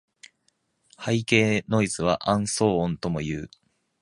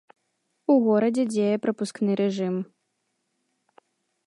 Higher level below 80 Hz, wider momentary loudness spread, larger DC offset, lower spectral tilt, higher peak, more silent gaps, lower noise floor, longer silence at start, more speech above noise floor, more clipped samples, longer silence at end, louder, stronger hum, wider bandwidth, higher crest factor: first, -52 dBFS vs -78 dBFS; about the same, 12 LU vs 11 LU; neither; second, -5 dB/octave vs -7 dB/octave; first, -4 dBFS vs -10 dBFS; neither; second, -71 dBFS vs -76 dBFS; first, 1 s vs 0.7 s; second, 47 dB vs 53 dB; neither; second, 0.55 s vs 1.6 s; about the same, -24 LUFS vs -24 LUFS; neither; about the same, 11.5 kHz vs 11.5 kHz; first, 22 dB vs 16 dB